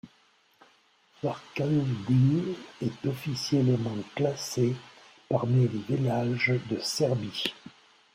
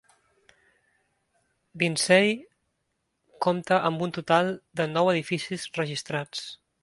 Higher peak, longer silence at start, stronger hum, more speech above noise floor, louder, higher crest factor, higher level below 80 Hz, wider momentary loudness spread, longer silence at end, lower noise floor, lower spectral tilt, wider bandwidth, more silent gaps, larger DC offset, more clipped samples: second, -12 dBFS vs -6 dBFS; second, 0.05 s vs 1.75 s; neither; second, 37 dB vs 52 dB; about the same, -28 LUFS vs -26 LUFS; about the same, 18 dB vs 22 dB; first, -64 dBFS vs -70 dBFS; about the same, 10 LU vs 12 LU; first, 0.45 s vs 0.25 s; second, -64 dBFS vs -77 dBFS; first, -6 dB/octave vs -4.5 dB/octave; first, 16 kHz vs 11.5 kHz; neither; neither; neither